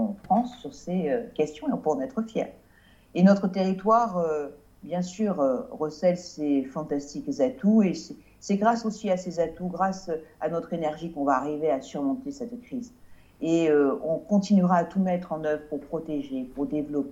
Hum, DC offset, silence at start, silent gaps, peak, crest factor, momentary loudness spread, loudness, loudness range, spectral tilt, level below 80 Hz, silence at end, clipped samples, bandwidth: none; under 0.1%; 0 s; none; -8 dBFS; 18 dB; 12 LU; -27 LUFS; 4 LU; -7 dB/octave; -60 dBFS; 0 s; under 0.1%; 8 kHz